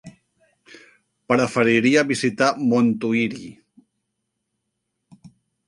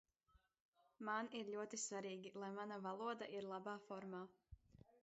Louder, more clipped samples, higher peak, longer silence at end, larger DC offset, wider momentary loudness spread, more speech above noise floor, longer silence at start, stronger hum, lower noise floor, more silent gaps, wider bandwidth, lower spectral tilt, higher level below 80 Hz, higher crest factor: first, -19 LUFS vs -49 LUFS; neither; first, -2 dBFS vs -32 dBFS; first, 2.15 s vs 0.05 s; neither; about the same, 8 LU vs 10 LU; first, 58 dB vs 30 dB; second, 0.05 s vs 0.35 s; neither; about the same, -77 dBFS vs -80 dBFS; second, none vs 0.60-0.73 s; first, 11.5 kHz vs 8 kHz; first, -5 dB/octave vs -3.5 dB/octave; first, -64 dBFS vs -80 dBFS; about the same, 20 dB vs 18 dB